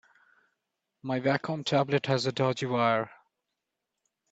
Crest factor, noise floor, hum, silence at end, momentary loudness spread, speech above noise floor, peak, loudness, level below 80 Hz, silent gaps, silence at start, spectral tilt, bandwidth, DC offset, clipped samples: 20 dB; -85 dBFS; none; 1.2 s; 7 LU; 58 dB; -10 dBFS; -28 LUFS; -72 dBFS; none; 1.05 s; -6 dB/octave; 8.2 kHz; under 0.1%; under 0.1%